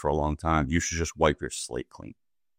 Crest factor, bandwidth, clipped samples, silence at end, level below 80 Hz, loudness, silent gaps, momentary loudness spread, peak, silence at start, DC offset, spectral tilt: 20 dB; 16 kHz; under 0.1%; 0.45 s; -42 dBFS; -28 LUFS; none; 18 LU; -8 dBFS; 0 s; under 0.1%; -4.5 dB/octave